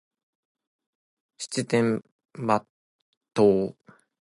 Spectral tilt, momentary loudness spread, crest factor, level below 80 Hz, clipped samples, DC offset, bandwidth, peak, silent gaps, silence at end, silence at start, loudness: -5.5 dB/octave; 12 LU; 22 dB; -66 dBFS; under 0.1%; under 0.1%; 11.5 kHz; -6 dBFS; 2.12-2.19 s, 2.70-3.21 s; 0.55 s; 1.4 s; -25 LUFS